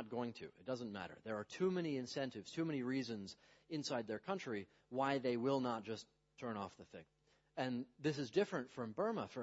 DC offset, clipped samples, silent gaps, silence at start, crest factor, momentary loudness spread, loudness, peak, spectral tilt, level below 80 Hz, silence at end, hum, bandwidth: under 0.1%; under 0.1%; none; 0 s; 20 dB; 12 LU; -43 LUFS; -22 dBFS; -5 dB/octave; -82 dBFS; 0 s; none; 7.6 kHz